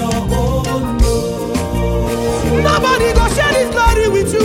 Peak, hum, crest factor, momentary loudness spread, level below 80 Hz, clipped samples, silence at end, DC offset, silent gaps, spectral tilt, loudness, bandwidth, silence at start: -2 dBFS; none; 12 dB; 6 LU; -20 dBFS; under 0.1%; 0 s; under 0.1%; none; -5 dB/octave; -15 LUFS; 16.5 kHz; 0 s